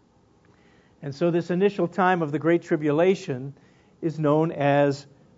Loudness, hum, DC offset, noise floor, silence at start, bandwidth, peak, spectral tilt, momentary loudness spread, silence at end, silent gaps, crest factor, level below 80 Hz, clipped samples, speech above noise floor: -23 LUFS; none; under 0.1%; -59 dBFS; 1.05 s; 7.8 kHz; -6 dBFS; -7.5 dB/octave; 13 LU; 0.35 s; none; 18 dB; -70 dBFS; under 0.1%; 36 dB